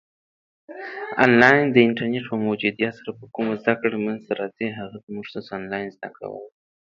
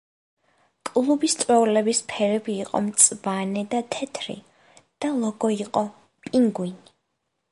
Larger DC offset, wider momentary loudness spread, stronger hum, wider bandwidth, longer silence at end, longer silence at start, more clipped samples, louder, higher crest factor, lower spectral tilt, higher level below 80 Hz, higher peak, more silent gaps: neither; first, 21 LU vs 16 LU; neither; second, 7.2 kHz vs 11.5 kHz; second, 0.4 s vs 0.75 s; second, 0.7 s vs 0.85 s; neither; about the same, -21 LUFS vs -23 LUFS; about the same, 22 dB vs 22 dB; first, -7 dB/octave vs -3.5 dB/octave; first, -64 dBFS vs -70 dBFS; about the same, 0 dBFS vs -2 dBFS; first, 5.03-5.07 s vs none